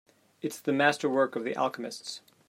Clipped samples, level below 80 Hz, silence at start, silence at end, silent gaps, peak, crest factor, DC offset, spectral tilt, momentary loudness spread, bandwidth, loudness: under 0.1%; -82 dBFS; 0.45 s; 0.3 s; none; -8 dBFS; 22 dB; under 0.1%; -4 dB/octave; 14 LU; 16 kHz; -29 LUFS